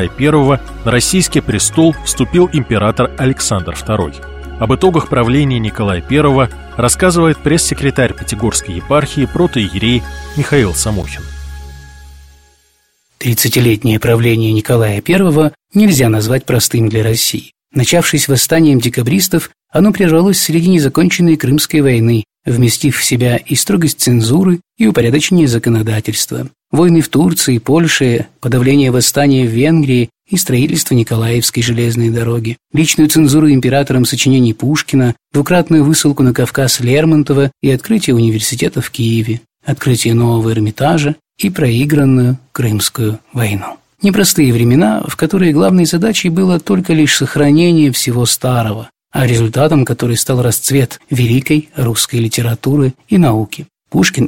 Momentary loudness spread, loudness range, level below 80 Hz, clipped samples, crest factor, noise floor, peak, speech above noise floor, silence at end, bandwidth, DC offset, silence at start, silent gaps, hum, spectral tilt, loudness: 7 LU; 3 LU; -34 dBFS; under 0.1%; 12 dB; -57 dBFS; 0 dBFS; 46 dB; 0 s; 17 kHz; 0.3%; 0 s; none; none; -5 dB/octave; -12 LUFS